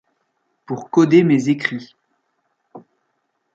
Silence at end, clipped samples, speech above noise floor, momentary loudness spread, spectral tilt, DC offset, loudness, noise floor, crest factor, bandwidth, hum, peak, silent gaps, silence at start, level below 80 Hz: 0.75 s; under 0.1%; 55 dB; 17 LU; -7 dB/octave; under 0.1%; -17 LUFS; -71 dBFS; 18 dB; 7.6 kHz; none; -2 dBFS; none; 0.7 s; -66 dBFS